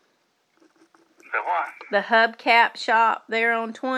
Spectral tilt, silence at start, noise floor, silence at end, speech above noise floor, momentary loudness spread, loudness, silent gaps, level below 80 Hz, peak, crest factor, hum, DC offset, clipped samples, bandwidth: -3 dB/octave; 1.3 s; -68 dBFS; 0 s; 46 dB; 9 LU; -21 LUFS; none; under -90 dBFS; -4 dBFS; 20 dB; none; under 0.1%; under 0.1%; 12.5 kHz